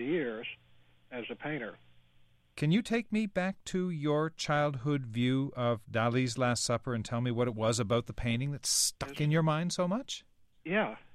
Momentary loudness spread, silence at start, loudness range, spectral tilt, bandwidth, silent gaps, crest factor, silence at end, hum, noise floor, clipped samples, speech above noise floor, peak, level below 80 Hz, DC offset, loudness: 12 LU; 0 s; 4 LU; -4.5 dB/octave; 15 kHz; none; 16 dB; 0 s; none; -64 dBFS; under 0.1%; 32 dB; -16 dBFS; -58 dBFS; under 0.1%; -32 LUFS